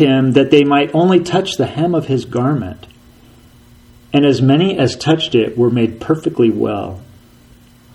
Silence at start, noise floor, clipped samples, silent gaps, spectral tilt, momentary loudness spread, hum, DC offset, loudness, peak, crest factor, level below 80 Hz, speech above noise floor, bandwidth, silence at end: 0 s; -45 dBFS; under 0.1%; none; -6.5 dB/octave; 8 LU; none; under 0.1%; -14 LUFS; 0 dBFS; 14 dB; -48 dBFS; 31 dB; 12 kHz; 0.9 s